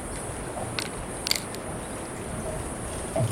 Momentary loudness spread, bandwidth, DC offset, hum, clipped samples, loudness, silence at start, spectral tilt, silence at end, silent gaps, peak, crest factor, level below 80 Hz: 7 LU; 16.5 kHz; under 0.1%; none; under 0.1%; -31 LUFS; 0 s; -3.5 dB/octave; 0 s; none; -8 dBFS; 24 dB; -44 dBFS